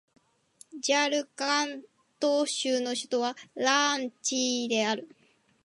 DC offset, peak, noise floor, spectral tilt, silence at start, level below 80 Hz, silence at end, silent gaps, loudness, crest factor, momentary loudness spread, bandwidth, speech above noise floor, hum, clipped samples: under 0.1%; -10 dBFS; -59 dBFS; -1 dB/octave; 0.75 s; -84 dBFS; 0.6 s; none; -28 LUFS; 20 dB; 9 LU; 11.5 kHz; 31 dB; none; under 0.1%